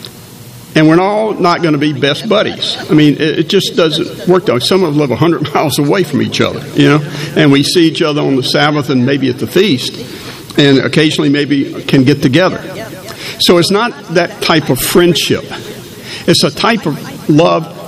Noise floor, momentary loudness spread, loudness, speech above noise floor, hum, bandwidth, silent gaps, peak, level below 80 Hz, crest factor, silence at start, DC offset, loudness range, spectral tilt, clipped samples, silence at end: -32 dBFS; 11 LU; -11 LUFS; 21 dB; none; 15.5 kHz; none; 0 dBFS; -46 dBFS; 12 dB; 0 s; under 0.1%; 1 LU; -5 dB/octave; 0.4%; 0 s